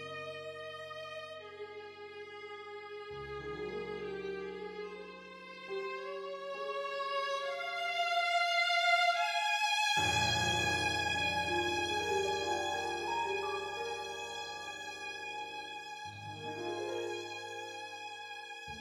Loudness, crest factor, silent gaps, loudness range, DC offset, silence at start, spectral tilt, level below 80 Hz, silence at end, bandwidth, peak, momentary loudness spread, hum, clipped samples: -35 LUFS; 18 dB; none; 13 LU; under 0.1%; 0 s; -2.5 dB/octave; -64 dBFS; 0 s; 19 kHz; -18 dBFS; 17 LU; none; under 0.1%